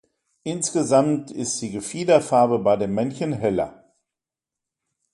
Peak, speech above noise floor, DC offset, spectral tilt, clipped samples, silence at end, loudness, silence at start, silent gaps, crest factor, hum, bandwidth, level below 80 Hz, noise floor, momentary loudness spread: -2 dBFS; 67 dB; under 0.1%; -5 dB/octave; under 0.1%; 1.45 s; -22 LUFS; 0.45 s; none; 20 dB; none; 11.5 kHz; -58 dBFS; -88 dBFS; 10 LU